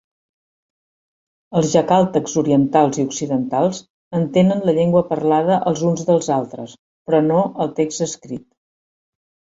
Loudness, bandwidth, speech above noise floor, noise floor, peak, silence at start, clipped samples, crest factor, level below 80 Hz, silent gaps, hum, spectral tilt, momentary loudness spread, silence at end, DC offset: -18 LUFS; 7.8 kHz; over 73 dB; under -90 dBFS; -2 dBFS; 1.5 s; under 0.1%; 16 dB; -58 dBFS; 3.90-4.11 s, 6.79-7.05 s; none; -6.5 dB/octave; 14 LU; 1.15 s; under 0.1%